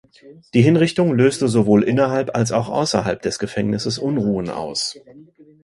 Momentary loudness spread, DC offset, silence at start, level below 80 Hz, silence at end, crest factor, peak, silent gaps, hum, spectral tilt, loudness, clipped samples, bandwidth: 8 LU; under 0.1%; 0.25 s; -52 dBFS; 0.4 s; 18 dB; 0 dBFS; none; none; -6 dB/octave; -19 LUFS; under 0.1%; 11.5 kHz